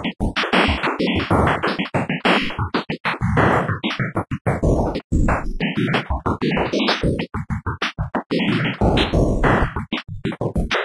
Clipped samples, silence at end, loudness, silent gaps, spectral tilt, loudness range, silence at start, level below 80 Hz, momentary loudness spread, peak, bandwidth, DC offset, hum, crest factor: under 0.1%; 0 s; -20 LUFS; 3.00-3.04 s, 4.41-4.45 s, 5.04-5.10 s, 8.26-8.30 s; -6.5 dB/octave; 2 LU; 0 s; -28 dBFS; 7 LU; 0 dBFS; 11 kHz; under 0.1%; none; 18 dB